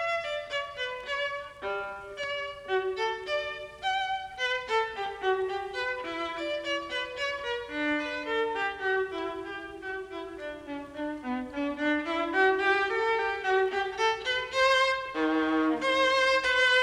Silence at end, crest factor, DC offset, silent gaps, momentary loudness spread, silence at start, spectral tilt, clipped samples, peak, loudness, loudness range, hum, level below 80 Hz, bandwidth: 0 s; 18 dB; under 0.1%; none; 13 LU; 0 s; -2.5 dB/octave; under 0.1%; -12 dBFS; -29 LUFS; 7 LU; none; -60 dBFS; 12 kHz